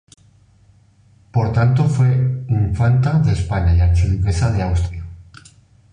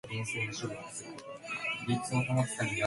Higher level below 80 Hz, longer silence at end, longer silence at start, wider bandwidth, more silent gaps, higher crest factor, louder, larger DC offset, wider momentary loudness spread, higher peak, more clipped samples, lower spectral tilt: first, -26 dBFS vs -66 dBFS; first, 0.7 s vs 0 s; first, 1.35 s vs 0.05 s; second, 10 kHz vs 11.5 kHz; neither; second, 12 dB vs 18 dB; first, -17 LUFS vs -34 LUFS; neither; second, 7 LU vs 12 LU; first, -4 dBFS vs -16 dBFS; neither; first, -8 dB/octave vs -4.5 dB/octave